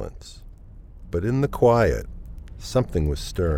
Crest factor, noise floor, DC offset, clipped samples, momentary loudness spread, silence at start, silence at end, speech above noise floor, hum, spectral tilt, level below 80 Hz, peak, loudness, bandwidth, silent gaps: 18 dB; -43 dBFS; under 0.1%; under 0.1%; 24 LU; 0 s; 0 s; 22 dB; none; -7 dB/octave; -34 dBFS; -6 dBFS; -23 LUFS; 16.5 kHz; none